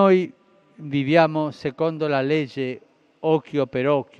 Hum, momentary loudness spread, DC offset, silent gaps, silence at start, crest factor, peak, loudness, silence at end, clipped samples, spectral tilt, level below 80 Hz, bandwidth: none; 12 LU; under 0.1%; none; 0 s; 20 dB; -2 dBFS; -22 LUFS; 0.15 s; under 0.1%; -8 dB/octave; -66 dBFS; 7.6 kHz